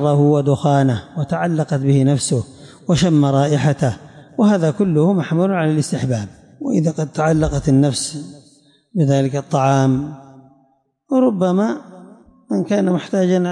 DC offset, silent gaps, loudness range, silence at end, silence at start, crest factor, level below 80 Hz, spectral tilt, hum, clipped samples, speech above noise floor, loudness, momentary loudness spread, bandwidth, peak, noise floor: under 0.1%; none; 3 LU; 0 s; 0 s; 12 dB; -44 dBFS; -6.5 dB/octave; none; under 0.1%; 44 dB; -17 LUFS; 10 LU; 11.5 kHz; -6 dBFS; -60 dBFS